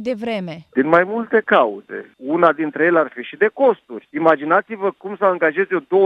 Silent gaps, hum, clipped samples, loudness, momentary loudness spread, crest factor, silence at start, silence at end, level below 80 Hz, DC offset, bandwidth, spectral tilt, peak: none; none; under 0.1%; -18 LUFS; 10 LU; 18 dB; 0 s; 0 s; -66 dBFS; under 0.1%; 6.2 kHz; -7.5 dB/octave; 0 dBFS